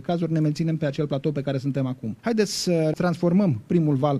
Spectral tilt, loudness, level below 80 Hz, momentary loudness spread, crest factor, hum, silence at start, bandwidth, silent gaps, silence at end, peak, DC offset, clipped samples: -6.5 dB/octave; -24 LUFS; -58 dBFS; 6 LU; 16 dB; none; 0 s; 13 kHz; none; 0 s; -8 dBFS; under 0.1%; under 0.1%